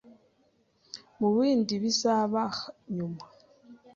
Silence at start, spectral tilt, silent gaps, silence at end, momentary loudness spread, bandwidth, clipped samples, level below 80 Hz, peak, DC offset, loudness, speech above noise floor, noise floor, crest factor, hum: 0.1 s; -5 dB/octave; none; 0.2 s; 20 LU; 7.6 kHz; under 0.1%; -72 dBFS; -14 dBFS; under 0.1%; -28 LUFS; 41 dB; -68 dBFS; 16 dB; none